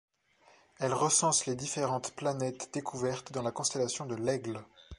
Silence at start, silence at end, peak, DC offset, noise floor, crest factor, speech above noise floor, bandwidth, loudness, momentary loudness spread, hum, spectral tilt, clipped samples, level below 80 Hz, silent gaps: 0.8 s; 0.05 s; -14 dBFS; under 0.1%; -65 dBFS; 20 dB; 32 dB; 11.5 kHz; -32 LUFS; 11 LU; none; -3.5 dB/octave; under 0.1%; -64 dBFS; none